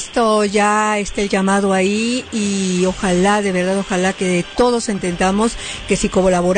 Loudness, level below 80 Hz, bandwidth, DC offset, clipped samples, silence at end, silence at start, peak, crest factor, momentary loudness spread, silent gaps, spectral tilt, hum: -17 LUFS; -38 dBFS; 9.6 kHz; under 0.1%; under 0.1%; 0 s; 0 s; -4 dBFS; 12 dB; 5 LU; none; -4.5 dB/octave; none